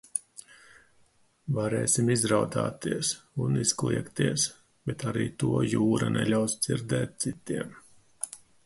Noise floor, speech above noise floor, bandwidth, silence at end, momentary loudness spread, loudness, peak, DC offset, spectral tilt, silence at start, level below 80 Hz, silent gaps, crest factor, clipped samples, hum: -64 dBFS; 36 dB; 12 kHz; 0.3 s; 13 LU; -28 LUFS; -10 dBFS; under 0.1%; -4.5 dB/octave; 0.15 s; -58 dBFS; none; 20 dB; under 0.1%; none